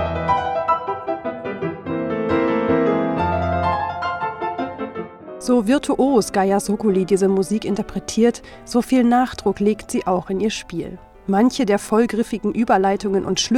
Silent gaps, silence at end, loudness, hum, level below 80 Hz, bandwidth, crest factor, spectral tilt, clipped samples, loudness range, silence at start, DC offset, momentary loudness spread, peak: none; 0 s; -20 LUFS; none; -46 dBFS; 14.5 kHz; 16 dB; -5.5 dB/octave; under 0.1%; 2 LU; 0 s; under 0.1%; 10 LU; -4 dBFS